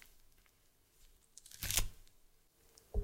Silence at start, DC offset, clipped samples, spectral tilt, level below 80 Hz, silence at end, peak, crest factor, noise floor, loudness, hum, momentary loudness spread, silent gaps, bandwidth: 1.55 s; under 0.1%; under 0.1%; -1.5 dB/octave; -48 dBFS; 0 s; -10 dBFS; 34 dB; -71 dBFS; -39 LUFS; none; 23 LU; none; 16.5 kHz